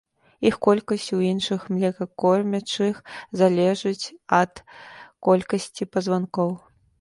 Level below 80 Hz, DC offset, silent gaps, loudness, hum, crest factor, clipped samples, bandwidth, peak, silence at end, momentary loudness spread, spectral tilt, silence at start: -62 dBFS; under 0.1%; none; -23 LUFS; none; 20 dB; under 0.1%; 11.5 kHz; -4 dBFS; 0.45 s; 12 LU; -6 dB/octave; 0.4 s